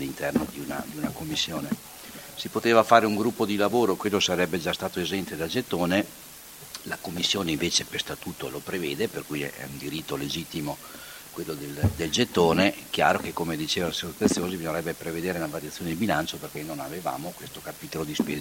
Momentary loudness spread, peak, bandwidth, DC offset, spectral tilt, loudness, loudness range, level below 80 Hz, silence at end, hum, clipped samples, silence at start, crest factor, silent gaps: 14 LU; -2 dBFS; 17 kHz; under 0.1%; -4 dB/octave; -27 LUFS; 7 LU; -52 dBFS; 0 s; none; under 0.1%; 0 s; 26 dB; none